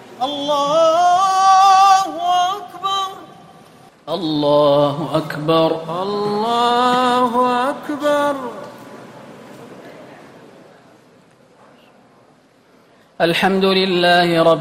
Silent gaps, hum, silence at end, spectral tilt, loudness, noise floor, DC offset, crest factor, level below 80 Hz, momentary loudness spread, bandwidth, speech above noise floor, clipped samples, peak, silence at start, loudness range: none; none; 0 s; -4.5 dB/octave; -16 LUFS; -52 dBFS; under 0.1%; 16 dB; -60 dBFS; 13 LU; 16 kHz; 36 dB; under 0.1%; -2 dBFS; 0 s; 11 LU